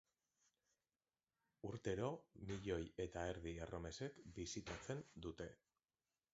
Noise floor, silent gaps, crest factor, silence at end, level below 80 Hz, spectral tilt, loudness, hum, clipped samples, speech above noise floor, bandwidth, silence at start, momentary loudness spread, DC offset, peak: under -90 dBFS; none; 20 dB; 0.8 s; -64 dBFS; -5.5 dB/octave; -50 LUFS; none; under 0.1%; over 41 dB; 7.6 kHz; 1.65 s; 8 LU; under 0.1%; -30 dBFS